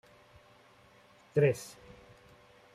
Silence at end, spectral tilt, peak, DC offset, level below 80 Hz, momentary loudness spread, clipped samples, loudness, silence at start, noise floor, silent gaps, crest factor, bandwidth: 1.05 s; -6.5 dB/octave; -16 dBFS; under 0.1%; -70 dBFS; 27 LU; under 0.1%; -31 LUFS; 1.35 s; -61 dBFS; none; 22 dB; 14.5 kHz